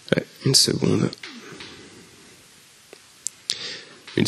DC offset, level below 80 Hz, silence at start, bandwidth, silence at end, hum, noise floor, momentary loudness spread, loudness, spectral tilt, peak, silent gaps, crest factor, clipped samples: under 0.1%; -60 dBFS; 0.1 s; 13 kHz; 0 s; none; -51 dBFS; 23 LU; -22 LUFS; -3.5 dB/octave; 0 dBFS; none; 26 dB; under 0.1%